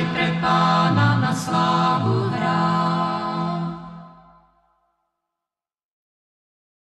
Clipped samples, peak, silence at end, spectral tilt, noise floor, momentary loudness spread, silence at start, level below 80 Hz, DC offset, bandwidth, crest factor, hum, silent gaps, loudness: under 0.1%; -6 dBFS; 2.85 s; -6 dB/octave; -88 dBFS; 9 LU; 0 s; -56 dBFS; under 0.1%; 12 kHz; 16 dB; none; none; -20 LUFS